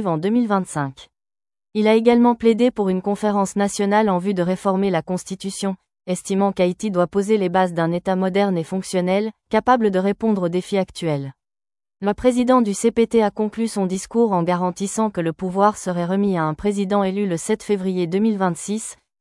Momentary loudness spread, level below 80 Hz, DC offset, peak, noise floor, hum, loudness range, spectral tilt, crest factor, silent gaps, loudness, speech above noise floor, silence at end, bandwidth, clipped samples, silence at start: 9 LU; -54 dBFS; under 0.1%; -2 dBFS; under -90 dBFS; none; 3 LU; -6 dB/octave; 16 dB; none; -20 LUFS; over 71 dB; 0.25 s; 12 kHz; under 0.1%; 0 s